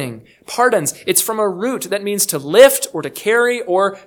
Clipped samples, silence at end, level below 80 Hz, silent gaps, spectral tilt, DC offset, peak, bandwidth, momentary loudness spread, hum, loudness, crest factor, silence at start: 0.3%; 0.1 s; -60 dBFS; none; -2.5 dB/octave; under 0.1%; 0 dBFS; 19.5 kHz; 12 LU; none; -15 LUFS; 16 dB; 0 s